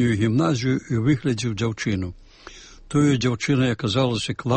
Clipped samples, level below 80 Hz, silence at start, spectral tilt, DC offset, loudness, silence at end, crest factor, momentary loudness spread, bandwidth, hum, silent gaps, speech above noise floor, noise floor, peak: under 0.1%; -48 dBFS; 0 s; -6 dB/octave; under 0.1%; -22 LUFS; 0 s; 14 dB; 6 LU; 8.8 kHz; none; none; 23 dB; -44 dBFS; -8 dBFS